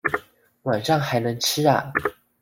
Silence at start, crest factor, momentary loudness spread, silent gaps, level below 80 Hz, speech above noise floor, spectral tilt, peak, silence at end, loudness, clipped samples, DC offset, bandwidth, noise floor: 0.05 s; 20 dB; 10 LU; none; -56 dBFS; 24 dB; -4 dB/octave; -4 dBFS; 0.3 s; -23 LUFS; under 0.1%; under 0.1%; 16.5 kHz; -45 dBFS